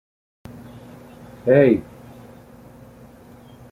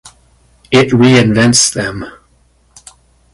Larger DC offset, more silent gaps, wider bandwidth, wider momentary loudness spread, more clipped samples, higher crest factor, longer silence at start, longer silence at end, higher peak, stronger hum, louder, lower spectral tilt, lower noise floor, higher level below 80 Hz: neither; neither; first, 15.5 kHz vs 11.5 kHz; first, 28 LU vs 15 LU; neither; first, 22 dB vs 14 dB; first, 1.45 s vs 0.05 s; first, 1.9 s vs 1.25 s; about the same, -2 dBFS vs 0 dBFS; neither; second, -17 LUFS vs -10 LUFS; first, -9 dB/octave vs -4 dB/octave; second, -45 dBFS vs -52 dBFS; second, -56 dBFS vs -42 dBFS